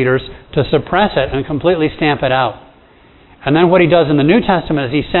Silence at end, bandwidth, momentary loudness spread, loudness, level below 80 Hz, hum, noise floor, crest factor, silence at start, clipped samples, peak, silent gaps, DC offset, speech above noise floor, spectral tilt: 0 s; 4.2 kHz; 8 LU; -14 LUFS; -36 dBFS; none; -45 dBFS; 14 dB; 0 s; under 0.1%; 0 dBFS; none; under 0.1%; 32 dB; -10 dB/octave